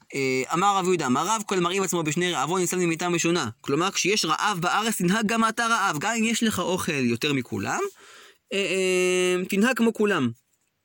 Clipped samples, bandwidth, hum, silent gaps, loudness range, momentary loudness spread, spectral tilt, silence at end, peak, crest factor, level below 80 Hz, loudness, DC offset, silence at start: under 0.1%; 17 kHz; none; none; 2 LU; 5 LU; -3.5 dB/octave; 0.5 s; -10 dBFS; 14 dB; -66 dBFS; -24 LUFS; under 0.1%; 0.1 s